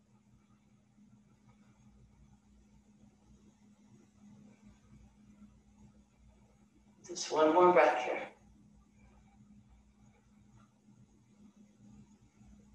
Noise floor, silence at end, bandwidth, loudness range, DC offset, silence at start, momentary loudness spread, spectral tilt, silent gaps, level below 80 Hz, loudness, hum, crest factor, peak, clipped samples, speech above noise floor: -67 dBFS; 4.45 s; 9.2 kHz; 15 LU; under 0.1%; 7.1 s; 23 LU; -4.5 dB/octave; none; -70 dBFS; -29 LUFS; 60 Hz at -70 dBFS; 24 dB; -14 dBFS; under 0.1%; 39 dB